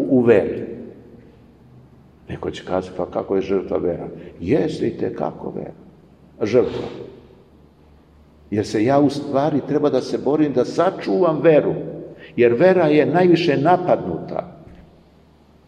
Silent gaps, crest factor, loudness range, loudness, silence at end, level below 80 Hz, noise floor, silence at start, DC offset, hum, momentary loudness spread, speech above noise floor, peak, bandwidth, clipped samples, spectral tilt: none; 18 dB; 9 LU; -19 LUFS; 0.85 s; -52 dBFS; -51 dBFS; 0 s; under 0.1%; none; 18 LU; 33 dB; -2 dBFS; 9.8 kHz; under 0.1%; -7.5 dB/octave